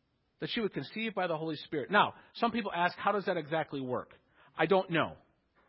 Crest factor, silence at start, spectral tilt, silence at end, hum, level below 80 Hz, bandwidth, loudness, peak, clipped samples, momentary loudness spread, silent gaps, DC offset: 22 dB; 0.4 s; -3 dB/octave; 0.5 s; none; -70 dBFS; 5.6 kHz; -33 LUFS; -12 dBFS; under 0.1%; 9 LU; none; under 0.1%